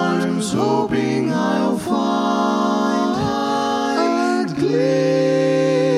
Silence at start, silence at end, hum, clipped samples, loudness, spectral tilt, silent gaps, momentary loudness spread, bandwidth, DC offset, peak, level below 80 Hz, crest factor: 0 s; 0 s; none; under 0.1%; -18 LUFS; -6 dB/octave; none; 3 LU; 14 kHz; under 0.1%; -6 dBFS; -54 dBFS; 12 dB